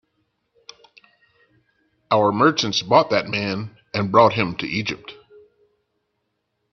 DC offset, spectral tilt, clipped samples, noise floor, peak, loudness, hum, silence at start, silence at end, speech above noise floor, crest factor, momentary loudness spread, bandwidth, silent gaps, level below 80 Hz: under 0.1%; -5 dB/octave; under 0.1%; -74 dBFS; 0 dBFS; -19 LUFS; none; 2.1 s; 1.6 s; 55 dB; 22 dB; 13 LU; 7 kHz; none; -60 dBFS